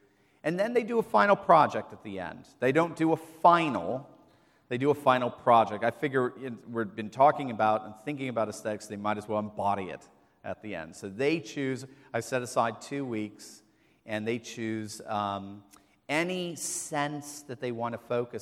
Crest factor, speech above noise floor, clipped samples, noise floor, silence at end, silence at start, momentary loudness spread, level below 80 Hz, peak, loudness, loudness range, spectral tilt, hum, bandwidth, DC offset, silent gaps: 22 dB; 33 dB; under 0.1%; -62 dBFS; 0 s; 0.45 s; 16 LU; -72 dBFS; -6 dBFS; -29 LUFS; 8 LU; -5 dB/octave; none; 15.5 kHz; under 0.1%; none